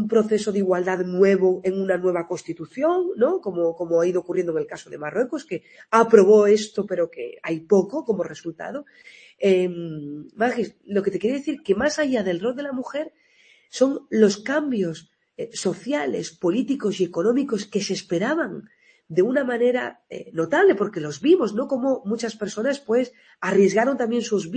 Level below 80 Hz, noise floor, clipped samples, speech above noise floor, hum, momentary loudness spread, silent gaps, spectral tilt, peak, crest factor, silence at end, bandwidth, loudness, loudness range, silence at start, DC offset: -66 dBFS; -57 dBFS; under 0.1%; 35 dB; none; 14 LU; none; -5.5 dB/octave; 0 dBFS; 22 dB; 0 s; 8.8 kHz; -22 LUFS; 5 LU; 0 s; under 0.1%